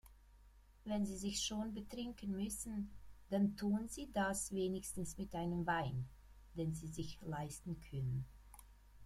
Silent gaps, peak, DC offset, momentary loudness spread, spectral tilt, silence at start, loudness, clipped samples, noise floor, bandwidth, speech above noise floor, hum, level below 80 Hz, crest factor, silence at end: none; -26 dBFS; under 0.1%; 10 LU; -5 dB/octave; 0.05 s; -42 LUFS; under 0.1%; -64 dBFS; 15.5 kHz; 23 dB; none; -60 dBFS; 18 dB; 0 s